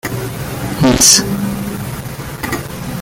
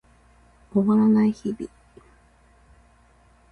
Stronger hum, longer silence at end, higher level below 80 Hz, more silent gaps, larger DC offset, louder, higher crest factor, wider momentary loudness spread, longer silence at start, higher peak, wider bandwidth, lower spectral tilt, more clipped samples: neither; second, 0 s vs 1.85 s; first, -34 dBFS vs -58 dBFS; neither; neither; first, -13 LUFS vs -22 LUFS; about the same, 16 dB vs 16 dB; about the same, 17 LU vs 17 LU; second, 0.05 s vs 0.75 s; first, 0 dBFS vs -8 dBFS; first, over 20 kHz vs 6.4 kHz; second, -3 dB/octave vs -9 dB/octave; neither